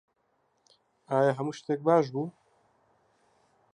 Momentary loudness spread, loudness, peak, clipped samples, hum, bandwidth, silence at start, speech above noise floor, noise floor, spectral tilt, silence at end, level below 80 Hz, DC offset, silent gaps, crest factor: 10 LU; -28 LUFS; -10 dBFS; under 0.1%; none; 10 kHz; 1.1 s; 46 dB; -73 dBFS; -7 dB/octave; 1.45 s; -82 dBFS; under 0.1%; none; 22 dB